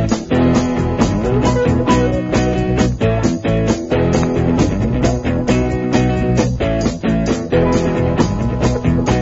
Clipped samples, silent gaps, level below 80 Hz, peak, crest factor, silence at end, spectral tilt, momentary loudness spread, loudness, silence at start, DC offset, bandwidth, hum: under 0.1%; none; -26 dBFS; 0 dBFS; 14 dB; 0 s; -6.5 dB/octave; 3 LU; -16 LUFS; 0 s; under 0.1%; 8 kHz; none